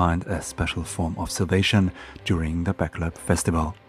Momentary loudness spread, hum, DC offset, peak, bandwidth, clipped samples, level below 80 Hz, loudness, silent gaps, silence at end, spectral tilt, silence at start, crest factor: 8 LU; none; under 0.1%; -4 dBFS; 15 kHz; under 0.1%; -38 dBFS; -25 LUFS; none; 0.15 s; -5 dB/octave; 0 s; 20 dB